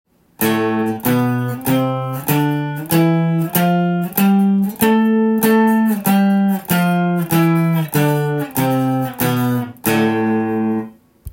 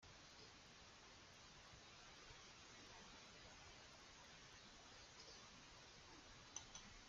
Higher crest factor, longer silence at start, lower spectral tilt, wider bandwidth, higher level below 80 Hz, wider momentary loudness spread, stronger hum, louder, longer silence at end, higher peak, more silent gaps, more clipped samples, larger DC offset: second, 14 dB vs 26 dB; first, 0.4 s vs 0 s; first, -6.5 dB/octave vs -2 dB/octave; first, 17 kHz vs 9 kHz; first, -52 dBFS vs -74 dBFS; about the same, 6 LU vs 5 LU; neither; first, -16 LUFS vs -61 LUFS; about the same, 0.05 s vs 0 s; first, -2 dBFS vs -36 dBFS; neither; neither; neither